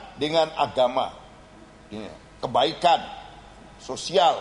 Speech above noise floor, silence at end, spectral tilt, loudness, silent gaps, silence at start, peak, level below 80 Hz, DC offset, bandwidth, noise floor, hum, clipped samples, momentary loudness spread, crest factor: 25 dB; 0 s; -3.5 dB/octave; -23 LUFS; none; 0 s; -6 dBFS; -56 dBFS; under 0.1%; 10.5 kHz; -48 dBFS; none; under 0.1%; 20 LU; 18 dB